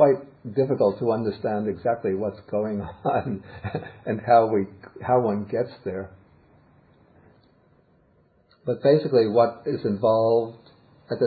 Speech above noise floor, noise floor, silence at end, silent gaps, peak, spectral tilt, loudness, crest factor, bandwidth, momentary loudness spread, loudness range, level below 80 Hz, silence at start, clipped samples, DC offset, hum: 38 dB; -61 dBFS; 0 s; none; -6 dBFS; -11.5 dB/octave; -24 LUFS; 20 dB; 4.8 kHz; 14 LU; 7 LU; -56 dBFS; 0 s; under 0.1%; under 0.1%; none